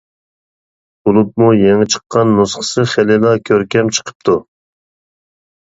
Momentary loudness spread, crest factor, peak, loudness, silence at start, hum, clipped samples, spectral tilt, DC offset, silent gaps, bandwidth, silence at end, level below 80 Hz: 6 LU; 14 dB; 0 dBFS; -13 LUFS; 1.05 s; none; under 0.1%; -5 dB/octave; under 0.1%; 2.06-2.10 s, 4.15-4.20 s; 8 kHz; 1.4 s; -48 dBFS